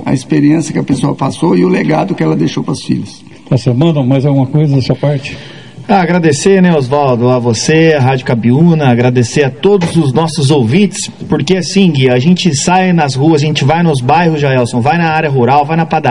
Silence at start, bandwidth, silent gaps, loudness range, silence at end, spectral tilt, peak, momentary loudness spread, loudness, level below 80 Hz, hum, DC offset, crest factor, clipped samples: 0 s; 11 kHz; none; 3 LU; 0 s; -6 dB/octave; 0 dBFS; 6 LU; -10 LUFS; -44 dBFS; none; 0.9%; 10 dB; 0.6%